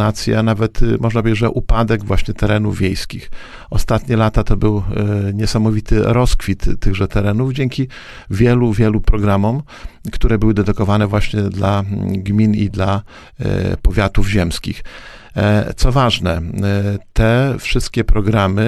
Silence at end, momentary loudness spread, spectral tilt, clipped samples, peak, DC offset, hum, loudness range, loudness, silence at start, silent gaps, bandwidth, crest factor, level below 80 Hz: 0 s; 10 LU; -6.5 dB/octave; under 0.1%; 0 dBFS; under 0.1%; none; 2 LU; -17 LUFS; 0 s; none; 13 kHz; 14 dB; -22 dBFS